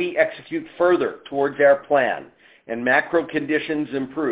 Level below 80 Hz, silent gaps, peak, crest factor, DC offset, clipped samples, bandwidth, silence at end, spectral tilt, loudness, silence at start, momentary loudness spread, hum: -64 dBFS; none; -4 dBFS; 18 dB; under 0.1%; under 0.1%; 4 kHz; 0 s; -9 dB/octave; -21 LUFS; 0 s; 10 LU; none